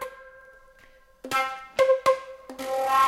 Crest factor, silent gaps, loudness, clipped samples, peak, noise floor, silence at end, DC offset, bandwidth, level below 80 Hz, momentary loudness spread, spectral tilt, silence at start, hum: 18 dB; none; -25 LUFS; under 0.1%; -8 dBFS; -55 dBFS; 0 s; under 0.1%; 16 kHz; -62 dBFS; 21 LU; -2 dB/octave; 0 s; none